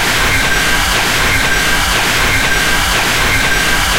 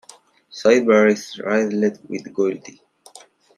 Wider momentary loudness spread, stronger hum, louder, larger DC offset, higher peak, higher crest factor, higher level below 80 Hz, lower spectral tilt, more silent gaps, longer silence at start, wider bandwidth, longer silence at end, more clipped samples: second, 0 LU vs 16 LU; neither; first, -11 LUFS vs -19 LUFS; first, 0.8% vs under 0.1%; about the same, 0 dBFS vs -2 dBFS; second, 12 dB vs 18 dB; first, -22 dBFS vs -70 dBFS; second, -2 dB/octave vs -5 dB/octave; neither; second, 0 s vs 0.55 s; first, 16 kHz vs 12 kHz; second, 0 s vs 0.85 s; neither